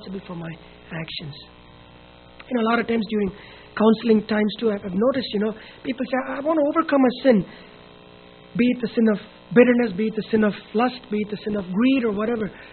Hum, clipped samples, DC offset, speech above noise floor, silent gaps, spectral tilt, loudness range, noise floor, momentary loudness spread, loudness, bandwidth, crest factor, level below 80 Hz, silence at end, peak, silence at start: 60 Hz at -45 dBFS; under 0.1%; under 0.1%; 25 dB; none; -5 dB/octave; 4 LU; -47 dBFS; 16 LU; -22 LUFS; 4.5 kHz; 22 dB; -54 dBFS; 0 s; 0 dBFS; 0 s